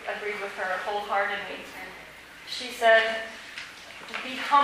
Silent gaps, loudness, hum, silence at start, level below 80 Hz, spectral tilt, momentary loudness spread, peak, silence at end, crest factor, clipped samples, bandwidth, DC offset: none; -27 LUFS; none; 0 s; -66 dBFS; -2 dB/octave; 20 LU; -8 dBFS; 0 s; 20 dB; under 0.1%; 15.5 kHz; under 0.1%